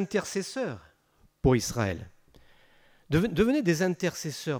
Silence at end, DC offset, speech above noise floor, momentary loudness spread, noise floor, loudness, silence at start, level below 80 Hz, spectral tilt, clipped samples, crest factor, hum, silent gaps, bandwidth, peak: 0 s; under 0.1%; 38 dB; 10 LU; -65 dBFS; -28 LUFS; 0 s; -48 dBFS; -5.5 dB/octave; under 0.1%; 18 dB; none; none; over 20 kHz; -10 dBFS